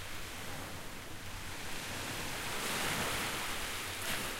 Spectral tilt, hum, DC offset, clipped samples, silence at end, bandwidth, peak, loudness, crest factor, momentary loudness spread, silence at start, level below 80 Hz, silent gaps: -2 dB/octave; none; under 0.1%; under 0.1%; 0 s; 16 kHz; -22 dBFS; -38 LUFS; 16 dB; 10 LU; 0 s; -52 dBFS; none